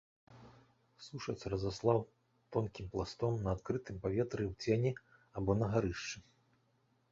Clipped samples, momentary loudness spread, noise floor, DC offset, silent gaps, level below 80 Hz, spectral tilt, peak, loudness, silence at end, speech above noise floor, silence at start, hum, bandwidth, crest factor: under 0.1%; 14 LU; -75 dBFS; under 0.1%; none; -56 dBFS; -6.5 dB/octave; -18 dBFS; -37 LUFS; 0.9 s; 39 dB; 0.3 s; none; 7.6 kHz; 22 dB